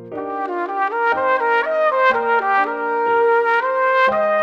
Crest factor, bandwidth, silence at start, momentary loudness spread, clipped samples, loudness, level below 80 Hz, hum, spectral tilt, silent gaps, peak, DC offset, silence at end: 14 dB; 7.2 kHz; 0 s; 8 LU; under 0.1%; -17 LUFS; -62 dBFS; none; -5 dB/octave; none; -4 dBFS; under 0.1%; 0 s